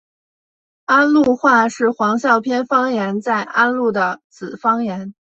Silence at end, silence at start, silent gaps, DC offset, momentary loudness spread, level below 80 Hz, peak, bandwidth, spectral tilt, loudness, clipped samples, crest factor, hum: 0.3 s; 0.9 s; 4.24-4.30 s; under 0.1%; 11 LU; -62 dBFS; -2 dBFS; 8.2 kHz; -5.5 dB/octave; -16 LUFS; under 0.1%; 16 dB; none